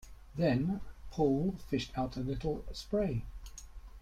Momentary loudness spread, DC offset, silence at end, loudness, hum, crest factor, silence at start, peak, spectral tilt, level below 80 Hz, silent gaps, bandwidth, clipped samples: 19 LU; under 0.1%; 0 s; -35 LUFS; none; 18 dB; 0 s; -18 dBFS; -7 dB/octave; -48 dBFS; none; 15 kHz; under 0.1%